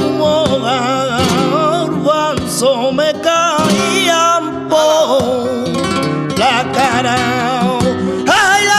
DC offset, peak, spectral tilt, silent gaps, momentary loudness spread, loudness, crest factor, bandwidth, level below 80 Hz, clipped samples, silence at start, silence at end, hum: under 0.1%; 0 dBFS; -4 dB/octave; none; 5 LU; -13 LUFS; 12 dB; 15 kHz; -44 dBFS; under 0.1%; 0 s; 0 s; none